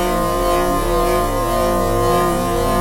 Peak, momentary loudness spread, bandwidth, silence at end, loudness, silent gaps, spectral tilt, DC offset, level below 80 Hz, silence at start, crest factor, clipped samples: -4 dBFS; 2 LU; 16.5 kHz; 0 s; -17 LUFS; none; -5 dB/octave; under 0.1%; -26 dBFS; 0 s; 12 dB; under 0.1%